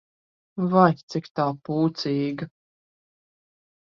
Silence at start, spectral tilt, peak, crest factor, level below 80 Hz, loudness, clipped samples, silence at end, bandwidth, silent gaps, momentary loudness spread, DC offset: 0.55 s; -7.5 dB/octave; -4 dBFS; 22 dB; -68 dBFS; -24 LUFS; under 0.1%; 1.45 s; 7.2 kHz; 1.03-1.08 s, 1.31-1.35 s; 15 LU; under 0.1%